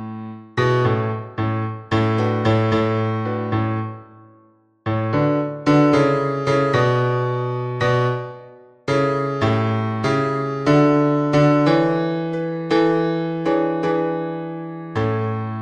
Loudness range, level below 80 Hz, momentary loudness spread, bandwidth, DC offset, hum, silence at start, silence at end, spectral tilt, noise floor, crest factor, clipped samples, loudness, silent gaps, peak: 4 LU; -52 dBFS; 11 LU; 9 kHz; under 0.1%; none; 0 s; 0 s; -7.5 dB/octave; -55 dBFS; 16 dB; under 0.1%; -20 LUFS; none; -4 dBFS